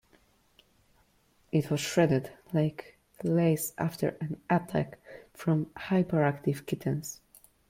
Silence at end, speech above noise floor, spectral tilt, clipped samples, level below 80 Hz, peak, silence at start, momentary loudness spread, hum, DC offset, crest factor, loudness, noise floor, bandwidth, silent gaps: 0.55 s; 38 dB; -6.5 dB/octave; under 0.1%; -64 dBFS; -12 dBFS; 1.55 s; 12 LU; none; under 0.1%; 18 dB; -30 LUFS; -67 dBFS; 16.5 kHz; none